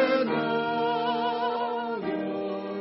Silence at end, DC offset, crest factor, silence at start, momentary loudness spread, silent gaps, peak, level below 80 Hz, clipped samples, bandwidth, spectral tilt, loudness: 0 s; under 0.1%; 14 dB; 0 s; 5 LU; none; -12 dBFS; -70 dBFS; under 0.1%; 5.8 kHz; -3 dB/octave; -28 LUFS